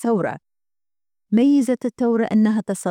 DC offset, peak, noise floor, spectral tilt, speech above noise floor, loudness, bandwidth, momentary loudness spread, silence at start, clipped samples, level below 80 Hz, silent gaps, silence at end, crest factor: under 0.1%; -8 dBFS; under -90 dBFS; -6.5 dB/octave; over 72 dB; -19 LUFS; 13.5 kHz; 7 LU; 0 s; under 0.1%; -66 dBFS; none; 0 s; 12 dB